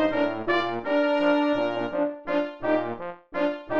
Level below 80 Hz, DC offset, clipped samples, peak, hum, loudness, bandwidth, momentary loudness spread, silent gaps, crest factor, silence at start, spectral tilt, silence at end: -60 dBFS; 0.4%; under 0.1%; -10 dBFS; none; -26 LUFS; 7 kHz; 6 LU; none; 14 dB; 0 s; -6.5 dB/octave; 0 s